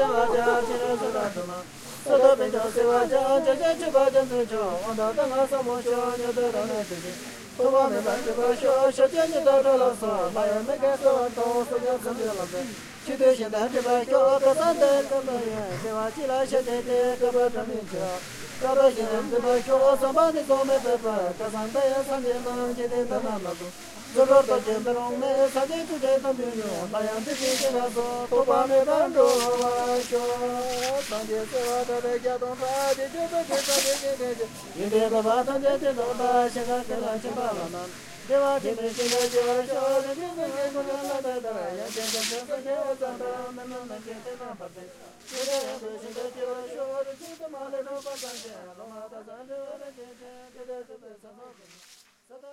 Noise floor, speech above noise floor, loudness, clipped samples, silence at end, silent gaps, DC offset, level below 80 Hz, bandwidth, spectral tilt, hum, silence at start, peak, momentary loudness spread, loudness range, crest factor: -54 dBFS; 29 dB; -25 LUFS; under 0.1%; 0 s; none; under 0.1%; -58 dBFS; 16 kHz; -3.5 dB/octave; none; 0 s; -6 dBFS; 16 LU; 11 LU; 20 dB